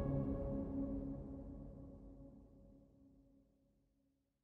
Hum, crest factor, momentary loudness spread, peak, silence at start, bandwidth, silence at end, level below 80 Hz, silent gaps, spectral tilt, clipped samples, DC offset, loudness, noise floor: none; 18 dB; 23 LU; -28 dBFS; 0 s; 2.9 kHz; 1.2 s; -54 dBFS; none; -12 dB/octave; under 0.1%; under 0.1%; -45 LUFS; -82 dBFS